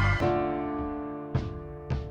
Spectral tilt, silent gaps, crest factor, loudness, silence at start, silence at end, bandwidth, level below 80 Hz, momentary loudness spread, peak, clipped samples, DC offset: -8 dB/octave; none; 16 dB; -31 LUFS; 0 s; 0 s; 8.6 kHz; -40 dBFS; 10 LU; -14 dBFS; under 0.1%; under 0.1%